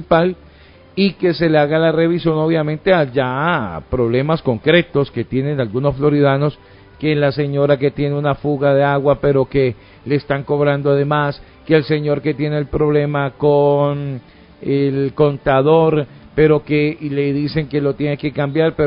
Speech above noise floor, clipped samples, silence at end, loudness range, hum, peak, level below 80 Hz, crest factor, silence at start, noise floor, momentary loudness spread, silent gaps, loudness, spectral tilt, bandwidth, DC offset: 28 dB; under 0.1%; 0 s; 1 LU; none; 0 dBFS; -42 dBFS; 16 dB; 0 s; -44 dBFS; 7 LU; none; -16 LUFS; -12.5 dB/octave; 5.4 kHz; under 0.1%